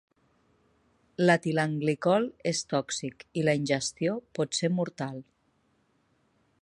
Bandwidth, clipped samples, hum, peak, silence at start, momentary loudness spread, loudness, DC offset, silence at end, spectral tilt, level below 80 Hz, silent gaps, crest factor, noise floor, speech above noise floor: 11.5 kHz; under 0.1%; none; -8 dBFS; 1.2 s; 11 LU; -28 LUFS; under 0.1%; 1.4 s; -5 dB/octave; -70 dBFS; none; 22 dB; -70 dBFS; 42 dB